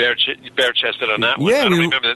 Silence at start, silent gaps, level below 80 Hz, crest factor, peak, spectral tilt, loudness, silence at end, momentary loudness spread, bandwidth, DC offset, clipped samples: 0 s; none; -56 dBFS; 12 dB; -4 dBFS; -4.5 dB/octave; -16 LUFS; 0 s; 4 LU; 12.5 kHz; under 0.1%; under 0.1%